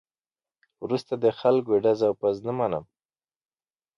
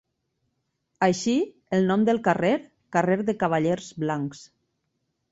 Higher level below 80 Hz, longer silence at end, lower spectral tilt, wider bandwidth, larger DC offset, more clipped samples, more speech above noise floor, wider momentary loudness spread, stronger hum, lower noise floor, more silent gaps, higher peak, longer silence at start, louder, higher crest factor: about the same, -66 dBFS vs -64 dBFS; first, 1.15 s vs 0.85 s; first, -7.5 dB/octave vs -6 dB/octave; second, 7.2 kHz vs 8 kHz; neither; neither; first, over 66 dB vs 53 dB; about the same, 8 LU vs 7 LU; neither; first, under -90 dBFS vs -77 dBFS; neither; second, -10 dBFS vs -6 dBFS; second, 0.8 s vs 1 s; about the same, -25 LUFS vs -24 LUFS; about the same, 18 dB vs 18 dB